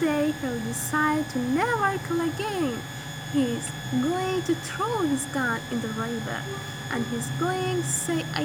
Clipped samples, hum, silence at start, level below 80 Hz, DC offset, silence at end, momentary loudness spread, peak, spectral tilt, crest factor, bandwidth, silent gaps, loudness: under 0.1%; none; 0 s; -56 dBFS; under 0.1%; 0 s; 7 LU; -8 dBFS; -4.5 dB/octave; 18 dB; over 20 kHz; none; -27 LUFS